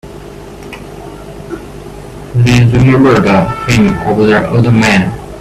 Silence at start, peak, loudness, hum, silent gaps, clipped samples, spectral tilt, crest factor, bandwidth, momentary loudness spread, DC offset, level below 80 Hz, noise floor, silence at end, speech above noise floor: 0.05 s; 0 dBFS; -9 LUFS; 50 Hz at -35 dBFS; none; under 0.1%; -6.5 dB/octave; 10 dB; 13.5 kHz; 21 LU; under 0.1%; -32 dBFS; -28 dBFS; 0 s; 20 dB